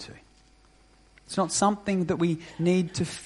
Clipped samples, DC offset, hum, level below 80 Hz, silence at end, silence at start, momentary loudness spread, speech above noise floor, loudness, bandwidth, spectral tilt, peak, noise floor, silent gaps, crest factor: under 0.1%; under 0.1%; none; -58 dBFS; 0 s; 0 s; 7 LU; 32 dB; -26 LUFS; 11.5 kHz; -5 dB/octave; -10 dBFS; -58 dBFS; none; 18 dB